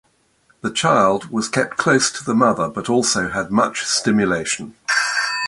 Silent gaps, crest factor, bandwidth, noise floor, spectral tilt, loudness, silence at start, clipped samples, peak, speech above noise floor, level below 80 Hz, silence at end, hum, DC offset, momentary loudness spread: none; 18 dB; 11.5 kHz; -59 dBFS; -3.5 dB/octave; -18 LUFS; 0.65 s; under 0.1%; -2 dBFS; 41 dB; -54 dBFS; 0 s; none; under 0.1%; 6 LU